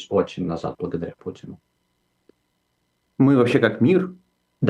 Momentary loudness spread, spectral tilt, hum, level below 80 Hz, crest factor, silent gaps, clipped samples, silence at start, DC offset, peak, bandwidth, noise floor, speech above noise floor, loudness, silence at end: 21 LU; -8 dB/octave; 60 Hz at -50 dBFS; -62 dBFS; 20 dB; none; under 0.1%; 0 s; under 0.1%; -2 dBFS; 10 kHz; -71 dBFS; 51 dB; -21 LUFS; 0 s